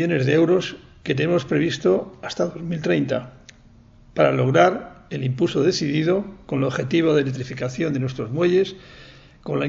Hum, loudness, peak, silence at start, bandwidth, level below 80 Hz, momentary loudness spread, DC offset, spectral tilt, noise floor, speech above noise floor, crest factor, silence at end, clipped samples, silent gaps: none; -21 LUFS; -2 dBFS; 0 s; 7.8 kHz; -54 dBFS; 13 LU; under 0.1%; -6.5 dB/octave; -50 dBFS; 29 dB; 20 dB; 0 s; under 0.1%; none